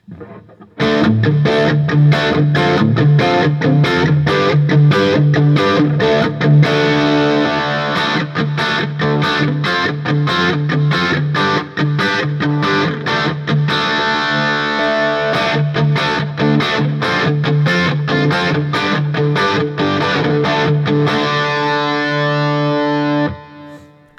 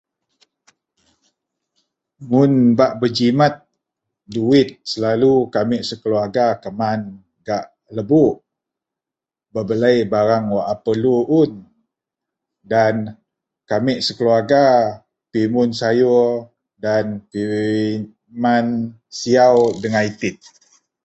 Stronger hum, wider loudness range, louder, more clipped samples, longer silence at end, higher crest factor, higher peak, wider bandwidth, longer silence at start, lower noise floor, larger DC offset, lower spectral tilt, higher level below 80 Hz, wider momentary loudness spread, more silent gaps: neither; about the same, 3 LU vs 4 LU; first, -14 LUFS vs -17 LUFS; neither; second, 0.4 s vs 0.7 s; about the same, 14 dB vs 16 dB; about the same, 0 dBFS vs -2 dBFS; about the same, 7.6 kHz vs 8.2 kHz; second, 0.1 s vs 2.2 s; second, -39 dBFS vs -88 dBFS; neither; about the same, -6.5 dB/octave vs -6.5 dB/octave; about the same, -52 dBFS vs -56 dBFS; second, 5 LU vs 13 LU; neither